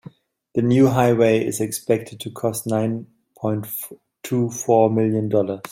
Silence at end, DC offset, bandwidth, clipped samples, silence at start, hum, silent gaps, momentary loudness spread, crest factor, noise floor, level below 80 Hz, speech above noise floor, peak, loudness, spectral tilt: 0.05 s; under 0.1%; 16.5 kHz; under 0.1%; 0.55 s; none; none; 13 LU; 18 dB; -45 dBFS; -60 dBFS; 25 dB; -2 dBFS; -20 LUFS; -6.5 dB/octave